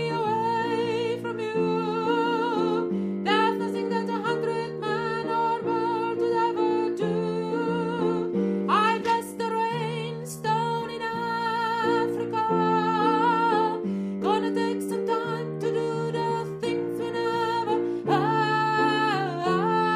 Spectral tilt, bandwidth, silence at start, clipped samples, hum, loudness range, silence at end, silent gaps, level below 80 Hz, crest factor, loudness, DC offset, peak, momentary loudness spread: -6 dB/octave; 15 kHz; 0 s; under 0.1%; none; 3 LU; 0 s; none; -68 dBFS; 16 dB; -26 LUFS; under 0.1%; -10 dBFS; 6 LU